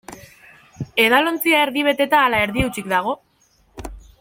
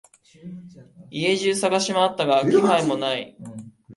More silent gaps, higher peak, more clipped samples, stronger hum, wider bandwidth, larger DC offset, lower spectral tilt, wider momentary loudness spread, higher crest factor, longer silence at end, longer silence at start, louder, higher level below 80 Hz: neither; about the same, -2 dBFS vs -4 dBFS; neither; neither; first, 16.5 kHz vs 11.5 kHz; neither; about the same, -4 dB/octave vs -4 dB/octave; about the same, 22 LU vs 22 LU; about the same, 18 dB vs 18 dB; first, 0.2 s vs 0 s; second, 0.1 s vs 0.45 s; first, -17 LUFS vs -21 LUFS; first, -42 dBFS vs -66 dBFS